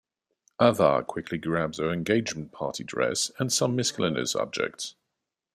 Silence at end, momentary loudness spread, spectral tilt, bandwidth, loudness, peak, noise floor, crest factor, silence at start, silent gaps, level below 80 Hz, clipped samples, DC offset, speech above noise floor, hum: 0.65 s; 10 LU; -4 dB/octave; 14.5 kHz; -27 LUFS; -4 dBFS; -84 dBFS; 24 dB; 0.6 s; none; -62 dBFS; under 0.1%; under 0.1%; 58 dB; none